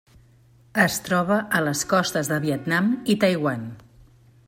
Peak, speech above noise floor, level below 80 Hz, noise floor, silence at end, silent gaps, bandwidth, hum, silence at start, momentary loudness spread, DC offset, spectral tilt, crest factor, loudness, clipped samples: -4 dBFS; 32 dB; -58 dBFS; -55 dBFS; 0.7 s; none; 16.5 kHz; none; 0.75 s; 6 LU; under 0.1%; -4.5 dB/octave; 20 dB; -22 LUFS; under 0.1%